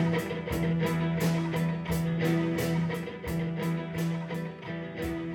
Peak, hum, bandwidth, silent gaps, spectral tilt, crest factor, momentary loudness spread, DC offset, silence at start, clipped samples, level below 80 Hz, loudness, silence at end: -16 dBFS; none; 17.5 kHz; none; -7 dB/octave; 14 dB; 7 LU; under 0.1%; 0 s; under 0.1%; -50 dBFS; -30 LUFS; 0 s